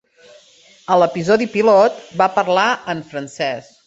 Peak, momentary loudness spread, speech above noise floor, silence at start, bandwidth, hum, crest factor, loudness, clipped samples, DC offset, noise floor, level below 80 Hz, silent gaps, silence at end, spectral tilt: -2 dBFS; 12 LU; 33 dB; 0.9 s; 8 kHz; none; 16 dB; -16 LUFS; under 0.1%; under 0.1%; -49 dBFS; -60 dBFS; none; 0.25 s; -5 dB/octave